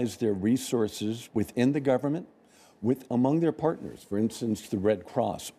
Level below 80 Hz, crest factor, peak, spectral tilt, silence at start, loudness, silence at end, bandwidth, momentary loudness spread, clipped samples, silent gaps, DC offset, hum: -64 dBFS; 14 dB; -14 dBFS; -6.5 dB/octave; 0 s; -28 LUFS; 0.05 s; 15.5 kHz; 7 LU; under 0.1%; none; under 0.1%; none